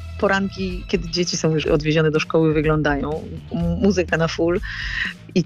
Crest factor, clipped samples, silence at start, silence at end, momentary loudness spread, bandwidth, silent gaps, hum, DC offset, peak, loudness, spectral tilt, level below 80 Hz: 12 dB; under 0.1%; 0 s; 0 s; 7 LU; 8 kHz; none; none; under 0.1%; -8 dBFS; -21 LUFS; -5.5 dB/octave; -36 dBFS